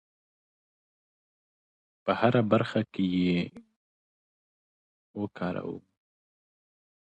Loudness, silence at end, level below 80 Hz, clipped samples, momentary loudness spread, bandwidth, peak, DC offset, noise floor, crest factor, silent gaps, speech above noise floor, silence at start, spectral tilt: -28 LUFS; 1.35 s; -64 dBFS; under 0.1%; 15 LU; 8.2 kHz; -10 dBFS; under 0.1%; under -90 dBFS; 24 dB; 3.76-5.14 s; over 63 dB; 2.05 s; -8.5 dB/octave